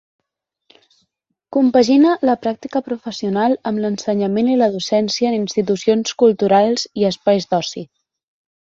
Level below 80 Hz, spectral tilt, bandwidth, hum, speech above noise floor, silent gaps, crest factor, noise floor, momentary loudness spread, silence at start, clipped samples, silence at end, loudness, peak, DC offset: -60 dBFS; -5.5 dB/octave; 7.8 kHz; none; 61 dB; none; 16 dB; -77 dBFS; 10 LU; 1.5 s; under 0.1%; 0.8 s; -17 LUFS; -2 dBFS; under 0.1%